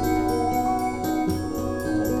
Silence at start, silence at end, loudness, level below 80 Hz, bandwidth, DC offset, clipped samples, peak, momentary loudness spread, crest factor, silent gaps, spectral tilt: 0 s; 0 s; -25 LUFS; -40 dBFS; 14.5 kHz; under 0.1%; under 0.1%; -12 dBFS; 4 LU; 12 dB; none; -6 dB/octave